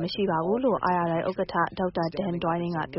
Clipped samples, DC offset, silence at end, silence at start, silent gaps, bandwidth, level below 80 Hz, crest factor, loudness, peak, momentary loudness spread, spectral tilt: under 0.1%; under 0.1%; 0 s; 0 s; none; 5.8 kHz; -56 dBFS; 16 dB; -27 LUFS; -10 dBFS; 4 LU; -5 dB/octave